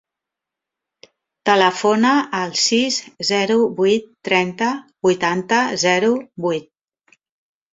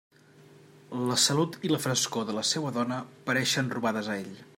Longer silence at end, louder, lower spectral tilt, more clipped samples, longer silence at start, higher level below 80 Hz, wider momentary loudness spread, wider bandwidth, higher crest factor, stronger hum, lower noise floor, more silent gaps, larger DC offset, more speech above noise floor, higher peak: first, 1.1 s vs 0.15 s; first, -18 LUFS vs -28 LUFS; about the same, -3.5 dB/octave vs -3.5 dB/octave; neither; first, 1.45 s vs 0.9 s; first, -64 dBFS vs -72 dBFS; second, 7 LU vs 10 LU; second, 8.2 kHz vs 16.5 kHz; about the same, 18 dB vs 20 dB; neither; first, -85 dBFS vs -55 dBFS; neither; neither; first, 67 dB vs 26 dB; first, -2 dBFS vs -10 dBFS